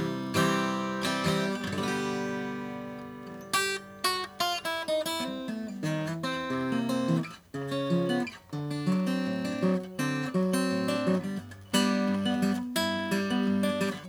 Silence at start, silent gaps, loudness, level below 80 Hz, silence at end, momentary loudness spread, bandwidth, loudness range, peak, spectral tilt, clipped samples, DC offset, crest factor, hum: 0 s; none; -30 LUFS; -66 dBFS; 0 s; 9 LU; over 20 kHz; 3 LU; -12 dBFS; -5 dB/octave; under 0.1%; under 0.1%; 18 dB; none